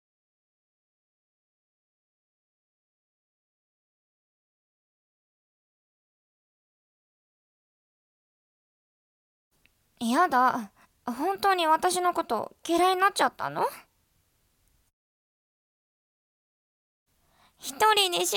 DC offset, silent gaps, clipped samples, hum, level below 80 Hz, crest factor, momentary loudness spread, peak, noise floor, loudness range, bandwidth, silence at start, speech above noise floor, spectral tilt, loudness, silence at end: under 0.1%; 14.93-17.06 s; under 0.1%; none; -72 dBFS; 22 dB; 14 LU; -8 dBFS; -70 dBFS; 11 LU; 17.5 kHz; 10 s; 45 dB; -2 dB/octave; -25 LUFS; 0 s